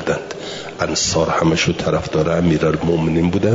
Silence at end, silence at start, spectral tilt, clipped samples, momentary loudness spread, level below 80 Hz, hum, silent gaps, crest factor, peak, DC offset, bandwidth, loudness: 0 s; 0 s; -5 dB/octave; under 0.1%; 8 LU; -42 dBFS; none; none; 14 dB; -4 dBFS; 0.1%; 7.8 kHz; -17 LUFS